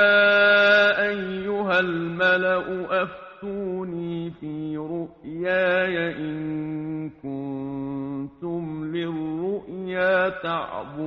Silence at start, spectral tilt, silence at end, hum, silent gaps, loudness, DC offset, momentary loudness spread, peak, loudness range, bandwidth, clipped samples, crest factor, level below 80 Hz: 0 s; -2.5 dB/octave; 0 s; none; none; -24 LUFS; under 0.1%; 16 LU; -6 dBFS; 9 LU; 7 kHz; under 0.1%; 18 dB; -58 dBFS